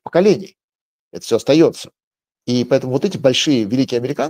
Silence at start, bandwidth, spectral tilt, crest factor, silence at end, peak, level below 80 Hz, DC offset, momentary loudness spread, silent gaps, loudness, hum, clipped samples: 0.05 s; 16 kHz; -5.5 dB/octave; 16 dB; 0 s; 0 dBFS; -62 dBFS; under 0.1%; 18 LU; 0.64-0.68 s, 0.75-1.11 s, 2.04-2.11 s; -16 LUFS; none; under 0.1%